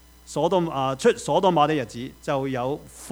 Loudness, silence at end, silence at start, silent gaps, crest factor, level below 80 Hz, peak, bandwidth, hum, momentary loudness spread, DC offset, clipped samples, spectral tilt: -24 LUFS; 0 s; 0.3 s; none; 18 dB; -54 dBFS; -6 dBFS; over 20 kHz; none; 13 LU; under 0.1%; under 0.1%; -5.5 dB/octave